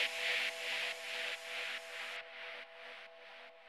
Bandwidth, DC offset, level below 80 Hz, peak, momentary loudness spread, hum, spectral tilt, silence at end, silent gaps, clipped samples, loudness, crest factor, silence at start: 19 kHz; under 0.1%; under -90 dBFS; -22 dBFS; 17 LU; none; 2 dB/octave; 0 s; none; under 0.1%; -39 LUFS; 20 dB; 0 s